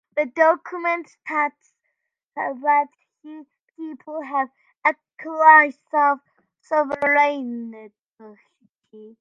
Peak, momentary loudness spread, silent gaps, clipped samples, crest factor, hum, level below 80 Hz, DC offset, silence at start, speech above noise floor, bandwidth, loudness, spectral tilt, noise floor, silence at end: 0 dBFS; 20 LU; 2.26-2.30 s, 3.62-3.67 s, 8.01-8.07 s, 8.69-8.79 s; under 0.1%; 22 dB; none; -76 dBFS; under 0.1%; 0.15 s; 57 dB; 7.4 kHz; -20 LUFS; -4.5 dB/octave; -78 dBFS; 0.15 s